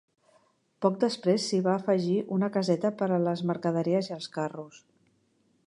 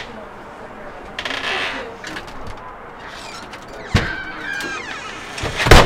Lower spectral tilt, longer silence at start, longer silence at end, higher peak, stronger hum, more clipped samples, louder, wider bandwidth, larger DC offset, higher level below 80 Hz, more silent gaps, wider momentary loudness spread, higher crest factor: first, -6.5 dB/octave vs -4 dB/octave; first, 0.8 s vs 0 s; first, 0.9 s vs 0 s; second, -10 dBFS vs 0 dBFS; neither; second, under 0.1% vs 0.2%; second, -28 LUFS vs -23 LUFS; second, 11 kHz vs 16.5 kHz; neither; second, -78 dBFS vs -26 dBFS; neither; second, 8 LU vs 15 LU; about the same, 20 dB vs 20 dB